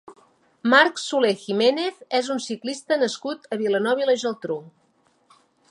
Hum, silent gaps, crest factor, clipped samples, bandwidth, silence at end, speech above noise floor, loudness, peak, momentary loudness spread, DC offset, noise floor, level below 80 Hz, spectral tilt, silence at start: none; none; 22 dB; under 0.1%; 11.5 kHz; 1 s; 42 dB; -22 LUFS; -2 dBFS; 13 LU; under 0.1%; -64 dBFS; -78 dBFS; -3.5 dB/octave; 0.1 s